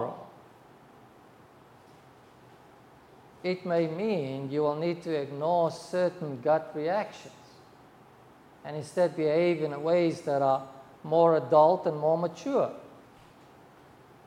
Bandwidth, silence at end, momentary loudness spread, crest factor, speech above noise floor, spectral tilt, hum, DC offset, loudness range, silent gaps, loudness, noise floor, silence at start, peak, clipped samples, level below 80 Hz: 11.5 kHz; 1.3 s; 16 LU; 20 dB; 28 dB; -7 dB/octave; none; under 0.1%; 9 LU; none; -28 LUFS; -55 dBFS; 0 s; -10 dBFS; under 0.1%; -74 dBFS